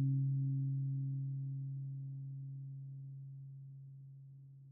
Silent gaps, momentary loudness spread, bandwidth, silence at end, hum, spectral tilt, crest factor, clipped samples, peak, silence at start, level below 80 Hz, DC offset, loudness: none; 19 LU; 0.5 kHz; 0 s; none; -22.5 dB/octave; 12 dB; under 0.1%; -28 dBFS; 0 s; -88 dBFS; under 0.1%; -41 LUFS